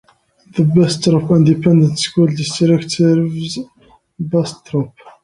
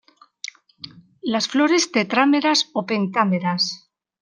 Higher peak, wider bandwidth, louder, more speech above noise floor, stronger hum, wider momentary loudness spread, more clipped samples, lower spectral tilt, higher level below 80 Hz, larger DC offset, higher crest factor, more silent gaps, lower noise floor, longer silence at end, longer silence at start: about the same, 0 dBFS vs -2 dBFS; about the same, 11 kHz vs 10 kHz; first, -15 LUFS vs -19 LUFS; first, 35 dB vs 23 dB; neither; second, 13 LU vs 21 LU; neither; first, -6.5 dB/octave vs -4 dB/octave; first, -52 dBFS vs -72 dBFS; neither; second, 14 dB vs 20 dB; neither; first, -49 dBFS vs -43 dBFS; second, 0.15 s vs 0.45 s; second, 0.55 s vs 0.85 s